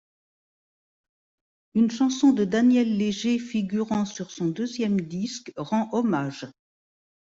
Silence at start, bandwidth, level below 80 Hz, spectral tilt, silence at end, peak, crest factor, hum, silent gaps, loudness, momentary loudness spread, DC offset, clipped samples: 1.75 s; 7.8 kHz; -66 dBFS; -6 dB/octave; 0.7 s; -10 dBFS; 16 dB; none; none; -25 LUFS; 11 LU; under 0.1%; under 0.1%